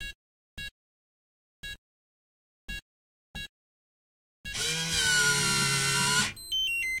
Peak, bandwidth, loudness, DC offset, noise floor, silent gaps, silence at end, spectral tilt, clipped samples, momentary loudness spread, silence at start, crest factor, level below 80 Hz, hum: -12 dBFS; 16.5 kHz; -25 LUFS; under 0.1%; under -90 dBFS; 0.15-0.57 s, 0.71-1.63 s, 1.78-2.68 s, 2.82-3.34 s, 3.49-4.44 s; 0 s; -1 dB/octave; under 0.1%; 21 LU; 0 s; 20 dB; -52 dBFS; none